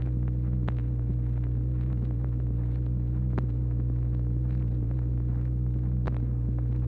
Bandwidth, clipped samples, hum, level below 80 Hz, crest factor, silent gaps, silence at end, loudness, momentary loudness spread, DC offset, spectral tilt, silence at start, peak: 2.8 kHz; under 0.1%; none; -30 dBFS; 12 dB; none; 0 s; -29 LUFS; 1 LU; under 0.1%; -11.5 dB/octave; 0 s; -16 dBFS